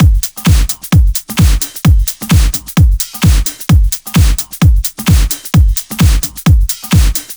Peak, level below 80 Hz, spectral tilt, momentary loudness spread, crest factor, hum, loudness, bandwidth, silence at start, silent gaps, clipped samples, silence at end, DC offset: 0 dBFS; -12 dBFS; -5 dB/octave; 2 LU; 10 dB; none; -12 LUFS; over 20 kHz; 0 s; none; under 0.1%; 0 s; under 0.1%